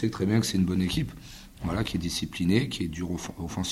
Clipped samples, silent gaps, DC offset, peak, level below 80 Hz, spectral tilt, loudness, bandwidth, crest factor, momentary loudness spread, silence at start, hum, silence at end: under 0.1%; none; under 0.1%; -10 dBFS; -46 dBFS; -5.5 dB/octave; -28 LUFS; 15.5 kHz; 18 dB; 11 LU; 0 s; none; 0 s